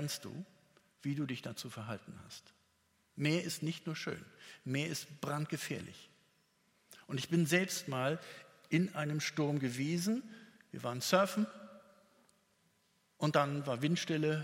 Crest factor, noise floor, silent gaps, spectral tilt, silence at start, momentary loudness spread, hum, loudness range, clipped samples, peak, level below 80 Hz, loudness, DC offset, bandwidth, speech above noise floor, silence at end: 24 dB; -75 dBFS; none; -5 dB/octave; 0 s; 20 LU; none; 6 LU; under 0.1%; -12 dBFS; -80 dBFS; -36 LUFS; under 0.1%; 16.5 kHz; 38 dB; 0 s